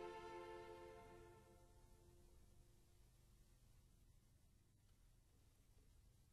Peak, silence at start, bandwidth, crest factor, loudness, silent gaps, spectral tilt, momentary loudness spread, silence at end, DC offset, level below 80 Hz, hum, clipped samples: -44 dBFS; 0 s; 13 kHz; 20 dB; -59 LUFS; none; -5 dB/octave; 11 LU; 0 s; under 0.1%; -74 dBFS; none; under 0.1%